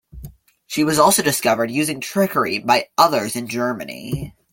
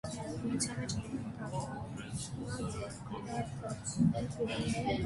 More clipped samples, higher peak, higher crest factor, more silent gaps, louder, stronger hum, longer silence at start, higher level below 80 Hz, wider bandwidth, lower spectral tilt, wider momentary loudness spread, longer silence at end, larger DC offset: neither; first, 0 dBFS vs -18 dBFS; about the same, 20 dB vs 18 dB; neither; first, -19 LUFS vs -37 LUFS; neither; about the same, 0.15 s vs 0.05 s; first, -48 dBFS vs -54 dBFS; first, 17 kHz vs 11.5 kHz; second, -3.5 dB/octave vs -5 dB/octave; first, 13 LU vs 10 LU; first, 0.25 s vs 0 s; neither